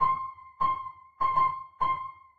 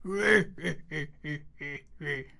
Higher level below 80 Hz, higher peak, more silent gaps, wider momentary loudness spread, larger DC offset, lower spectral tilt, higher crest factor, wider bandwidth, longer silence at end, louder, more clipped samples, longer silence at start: about the same, -56 dBFS vs -56 dBFS; second, -14 dBFS vs -10 dBFS; neither; second, 10 LU vs 16 LU; neither; about the same, -6 dB/octave vs -5 dB/octave; second, 16 dB vs 22 dB; second, 4.7 kHz vs 11.5 kHz; about the same, 0 s vs 0.1 s; about the same, -29 LUFS vs -30 LUFS; neither; about the same, 0 s vs 0 s